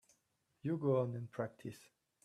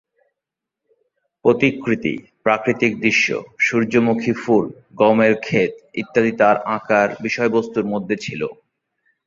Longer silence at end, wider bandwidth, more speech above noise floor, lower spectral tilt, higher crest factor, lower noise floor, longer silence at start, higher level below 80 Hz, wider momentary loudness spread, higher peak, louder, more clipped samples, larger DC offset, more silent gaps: second, 0.45 s vs 0.75 s; first, 13 kHz vs 7.6 kHz; second, 42 dB vs 66 dB; first, -8.5 dB/octave vs -5.5 dB/octave; about the same, 18 dB vs 18 dB; about the same, -81 dBFS vs -84 dBFS; second, 0.65 s vs 1.45 s; second, -80 dBFS vs -58 dBFS; first, 16 LU vs 8 LU; second, -22 dBFS vs -2 dBFS; second, -39 LUFS vs -18 LUFS; neither; neither; neither